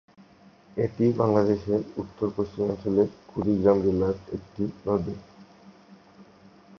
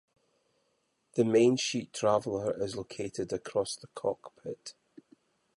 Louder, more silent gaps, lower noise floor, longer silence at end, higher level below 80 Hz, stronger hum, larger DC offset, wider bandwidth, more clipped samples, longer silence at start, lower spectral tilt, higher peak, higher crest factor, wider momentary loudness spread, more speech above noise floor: first, -26 LUFS vs -31 LUFS; neither; second, -54 dBFS vs -76 dBFS; second, 0.55 s vs 0.85 s; first, -52 dBFS vs -68 dBFS; neither; neither; second, 6.6 kHz vs 11.5 kHz; neither; second, 0.75 s vs 1.15 s; first, -9.5 dB/octave vs -5 dB/octave; first, -6 dBFS vs -12 dBFS; about the same, 22 dB vs 20 dB; second, 13 LU vs 18 LU; second, 29 dB vs 46 dB